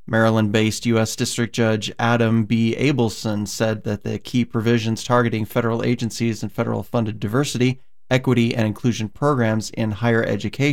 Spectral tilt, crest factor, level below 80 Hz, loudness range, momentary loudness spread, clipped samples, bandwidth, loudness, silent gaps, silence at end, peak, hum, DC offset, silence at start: -5.5 dB/octave; 16 dB; -52 dBFS; 2 LU; 6 LU; under 0.1%; 16.5 kHz; -21 LUFS; none; 0 s; -4 dBFS; none; 1%; 0.1 s